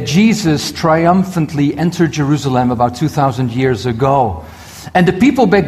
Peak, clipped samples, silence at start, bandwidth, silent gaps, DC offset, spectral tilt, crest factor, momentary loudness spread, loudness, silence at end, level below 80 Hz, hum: 0 dBFS; under 0.1%; 0 s; 14.5 kHz; none; under 0.1%; -6.5 dB/octave; 12 dB; 6 LU; -14 LUFS; 0 s; -40 dBFS; none